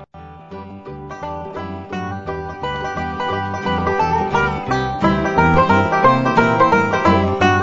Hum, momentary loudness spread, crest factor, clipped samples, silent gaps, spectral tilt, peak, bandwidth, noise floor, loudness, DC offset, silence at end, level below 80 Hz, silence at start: none; 16 LU; 16 dB; under 0.1%; none; -6.5 dB/octave; 0 dBFS; 7.8 kHz; -38 dBFS; -17 LUFS; under 0.1%; 0 s; -38 dBFS; 0 s